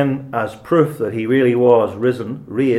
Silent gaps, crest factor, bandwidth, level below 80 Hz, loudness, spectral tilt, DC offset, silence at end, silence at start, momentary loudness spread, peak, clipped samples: none; 16 dB; 14 kHz; -58 dBFS; -17 LUFS; -8 dB/octave; under 0.1%; 0 s; 0 s; 10 LU; 0 dBFS; under 0.1%